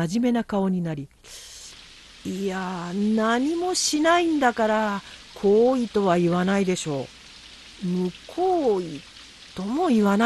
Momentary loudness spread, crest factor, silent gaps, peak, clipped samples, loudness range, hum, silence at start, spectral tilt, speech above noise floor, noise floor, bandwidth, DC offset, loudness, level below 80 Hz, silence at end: 21 LU; 16 dB; none; -6 dBFS; under 0.1%; 6 LU; none; 0 s; -5 dB/octave; 24 dB; -47 dBFS; 12.5 kHz; under 0.1%; -23 LUFS; -56 dBFS; 0 s